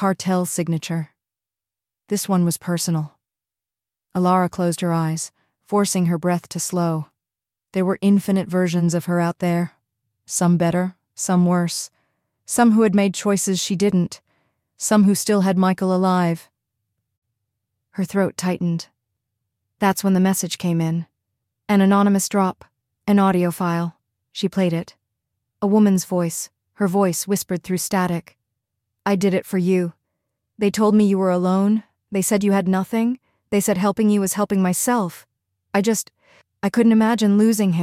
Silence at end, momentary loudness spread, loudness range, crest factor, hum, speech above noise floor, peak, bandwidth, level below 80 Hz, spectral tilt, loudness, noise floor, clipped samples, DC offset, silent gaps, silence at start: 0 s; 12 LU; 4 LU; 16 dB; none; 70 dB; -4 dBFS; 16 kHz; -62 dBFS; -5.5 dB/octave; -20 LUFS; -89 dBFS; under 0.1%; under 0.1%; 17.17-17.22 s; 0 s